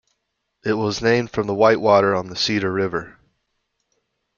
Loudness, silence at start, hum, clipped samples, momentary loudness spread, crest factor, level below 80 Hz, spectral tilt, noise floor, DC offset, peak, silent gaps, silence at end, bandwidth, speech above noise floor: -19 LUFS; 0.65 s; none; under 0.1%; 9 LU; 20 dB; -54 dBFS; -5 dB/octave; -75 dBFS; under 0.1%; -2 dBFS; none; 1.3 s; 7.2 kHz; 56 dB